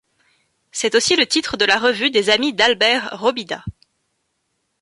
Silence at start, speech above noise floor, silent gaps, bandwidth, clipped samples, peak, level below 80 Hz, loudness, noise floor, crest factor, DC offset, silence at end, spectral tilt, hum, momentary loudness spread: 0.75 s; 54 dB; none; 11.5 kHz; under 0.1%; 0 dBFS; -52 dBFS; -16 LUFS; -71 dBFS; 18 dB; under 0.1%; 1.1 s; -2 dB/octave; none; 14 LU